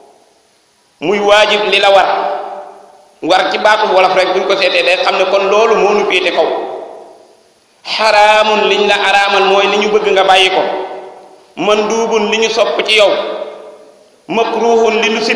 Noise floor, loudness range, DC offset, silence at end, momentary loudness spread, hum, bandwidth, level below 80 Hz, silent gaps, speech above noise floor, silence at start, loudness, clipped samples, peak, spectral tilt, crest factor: -52 dBFS; 4 LU; under 0.1%; 0 s; 14 LU; none; 11 kHz; -54 dBFS; none; 42 dB; 1 s; -10 LUFS; 0.5%; 0 dBFS; -2.5 dB/octave; 12 dB